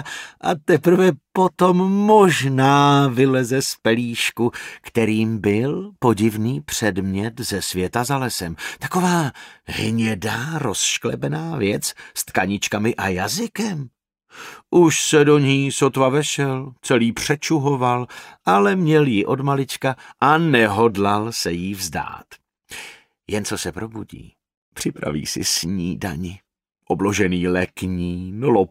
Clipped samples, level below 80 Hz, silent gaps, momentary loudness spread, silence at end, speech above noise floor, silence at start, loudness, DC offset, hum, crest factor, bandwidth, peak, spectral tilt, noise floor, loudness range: under 0.1%; -52 dBFS; 24.57-24.72 s; 13 LU; 0.05 s; 22 dB; 0 s; -19 LUFS; under 0.1%; none; 18 dB; 16 kHz; -2 dBFS; -5 dB/octave; -41 dBFS; 9 LU